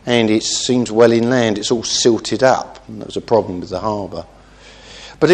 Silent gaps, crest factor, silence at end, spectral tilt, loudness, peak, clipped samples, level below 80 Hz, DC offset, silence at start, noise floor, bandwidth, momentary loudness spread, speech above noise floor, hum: none; 16 dB; 0 s; -4 dB/octave; -16 LUFS; 0 dBFS; under 0.1%; -48 dBFS; under 0.1%; 0.05 s; -42 dBFS; 10 kHz; 18 LU; 26 dB; none